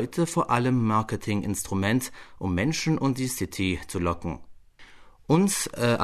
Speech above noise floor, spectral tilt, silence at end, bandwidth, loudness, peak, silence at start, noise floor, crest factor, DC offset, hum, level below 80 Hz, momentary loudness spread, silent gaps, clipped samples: 24 dB; -5 dB/octave; 0 s; 13.5 kHz; -26 LUFS; -8 dBFS; 0 s; -49 dBFS; 18 dB; under 0.1%; none; -48 dBFS; 7 LU; none; under 0.1%